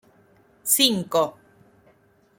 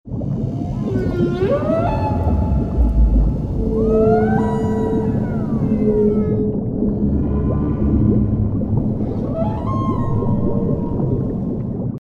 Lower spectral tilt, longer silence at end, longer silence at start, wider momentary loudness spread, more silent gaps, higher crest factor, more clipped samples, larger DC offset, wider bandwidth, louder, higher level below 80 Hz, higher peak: second, -2 dB/octave vs -10.5 dB/octave; first, 1.05 s vs 0 s; first, 0.65 s vs 0.05 s; first, 11 LU vs 6 LU; neither; first, 24 dB vs 14 dB; neither; neither; first, 17 kHz vs 7.2 kHz; about the same, -21 LUFS vs -19 LUFS; second, -68 dBFS vs -24 dBFS; about the same, -2 dBFS vs -4 dBFS